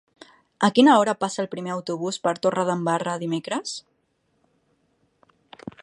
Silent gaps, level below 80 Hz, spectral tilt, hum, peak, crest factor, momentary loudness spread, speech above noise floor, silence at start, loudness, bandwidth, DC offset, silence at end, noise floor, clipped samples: none; -72 dBFS; -5 dB/octave; none; -2 dBFS; 22 dB; 15 LU; 48 dB; 0.6 s; -23 LUFS; 11.5 kHz; under 0.1%; 2 s; -70 dBFS; under 0.1%